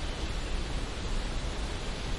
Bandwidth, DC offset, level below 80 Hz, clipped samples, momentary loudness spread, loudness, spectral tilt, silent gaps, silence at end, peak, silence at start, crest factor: 11.5 kHz; 0.1%; -34 dBFS; under 0.1%; 1 LU; -36 LUFS; -4.5 dB/octave; none; 0 s; -20 dBFS; 0 s; 12 dB